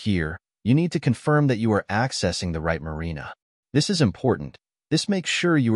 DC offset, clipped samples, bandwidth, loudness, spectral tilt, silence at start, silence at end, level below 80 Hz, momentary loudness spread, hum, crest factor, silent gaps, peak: under 0.1%; under 0.1%; 11.5 kHz; -23 LUFS; -5.5 dB/octave; 0 s; 0 s; -46 dBFS; 11 LU; none; 14 dB; 3.42-3.63 s; -8 dBFS